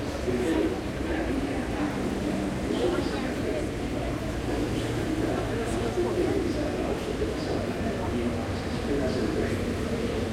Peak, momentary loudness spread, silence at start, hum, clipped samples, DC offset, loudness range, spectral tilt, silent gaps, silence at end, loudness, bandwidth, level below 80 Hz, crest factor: -14 dBFS; 4 LU; 0 s; none; under 0.1%; under 0.1%; 1 LU; -6 dB/octave; none; 0 s; -29 LUFS; 16 kHz; -40 dBFS; 14 dB